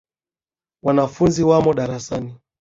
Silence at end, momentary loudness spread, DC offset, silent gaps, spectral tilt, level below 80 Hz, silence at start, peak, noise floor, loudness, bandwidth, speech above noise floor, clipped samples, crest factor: 0.25 s; 13 LU; under 0.1%; none; -7 dB/octave; -48 dBFS; 0.85 s; -2 dBFS; under -90 dBFS; -19 LUFS; 7.8 kHz; over 72 dB; under 0.1%; 16 dB